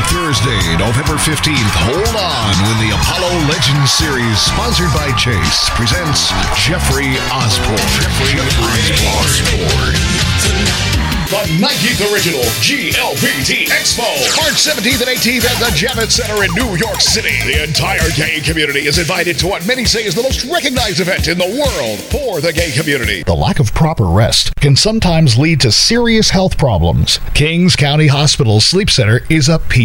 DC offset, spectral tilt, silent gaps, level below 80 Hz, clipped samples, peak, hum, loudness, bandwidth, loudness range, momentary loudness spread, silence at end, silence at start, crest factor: under 0.1%; -3.5 dB/octave; none; -24 dBFS; under 0.1%; 0 dBFS; none; -12 LUFS; 18.5 kHz; 3 LU; 4 LU; 0 s; 0 s; 12 dB